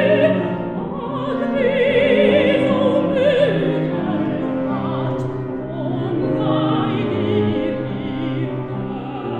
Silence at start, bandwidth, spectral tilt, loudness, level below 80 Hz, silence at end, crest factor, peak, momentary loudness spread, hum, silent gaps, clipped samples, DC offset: 0 s; 9 kHz; -8.5 dB/octave; -19 LUFS; -48 dBFS; 0 s; 16 dB; -2 dBFS; 10 LU; none; none; under 0.1%; under 0.1%